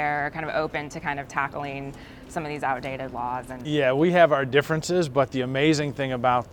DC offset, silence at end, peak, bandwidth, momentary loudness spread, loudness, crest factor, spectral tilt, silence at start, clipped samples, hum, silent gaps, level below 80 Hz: under 0.1%; 0 s; -4 dBFS; 19 kHz; 13 LU; -25 LUFS; 20 dB; -5.5 dB/octave; 0 s; under 0.1%; none; none; -52 dBFS